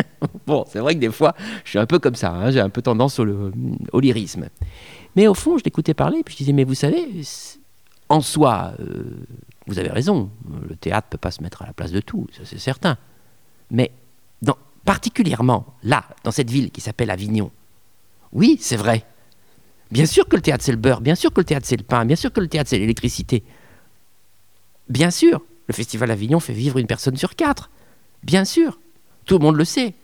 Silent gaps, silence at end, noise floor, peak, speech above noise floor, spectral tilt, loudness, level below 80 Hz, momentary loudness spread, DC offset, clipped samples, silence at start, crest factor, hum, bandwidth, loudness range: none; 0.1 s; -60 dBFS; 0 dBFS; 41 dB; -6 dB/octave; -19 LUFS; -44 dBFS; 14 LU; 0.3%; under 0.1%; 0 s; 20 dB; none; 19 kHz; 6 LU